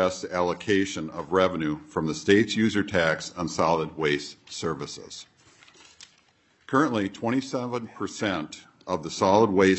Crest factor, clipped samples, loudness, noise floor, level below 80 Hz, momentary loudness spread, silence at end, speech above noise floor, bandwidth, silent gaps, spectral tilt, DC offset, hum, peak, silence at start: 20 dB; under 0.1%; -26 LUFS; -63 dBFS; -62 dBFS; 13 LU; 0 s; 38 dB; 8.6 kHz; none; -5 dB/octave; under 0.1%; none; -6 dBFS; 0 s